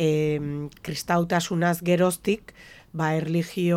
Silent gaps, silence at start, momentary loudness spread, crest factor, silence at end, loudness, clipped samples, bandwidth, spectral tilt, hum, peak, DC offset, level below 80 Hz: none; 0 s; 10 LU; 16 dB; 0 s; -25 LUFS; under 0.1%; 16.5 kHz; -6 dB/octave; none; -8 dBFS; under 0.1%; -56 dBFS